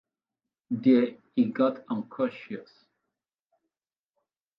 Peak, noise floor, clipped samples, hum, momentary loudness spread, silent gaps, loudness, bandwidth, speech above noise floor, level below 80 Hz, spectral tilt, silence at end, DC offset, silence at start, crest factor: -10 dBFS; under -90 dBFS; under 0.1%; none; 17 LU; none; -27 LUFS; 5.2 kHz; over 64 dB; -80 dBFS; -9.5 dB/octave; 1.95 s; under 0.1%; 0.7 s; 20 dB